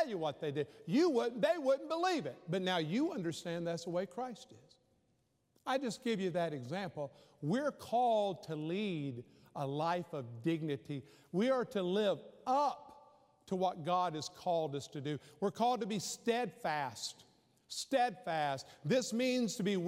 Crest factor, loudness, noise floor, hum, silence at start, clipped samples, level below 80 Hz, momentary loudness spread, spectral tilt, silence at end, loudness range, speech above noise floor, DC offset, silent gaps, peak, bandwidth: 16 dB; -37 LUFS; -77 dBFS; none; 0 s; under 0.1%; -84 dBFS; 10 LU; -5 dB/octave; 0 s; 5 LU; 41 dB; under 0.1%; none; -20 dBFS; 16 kHz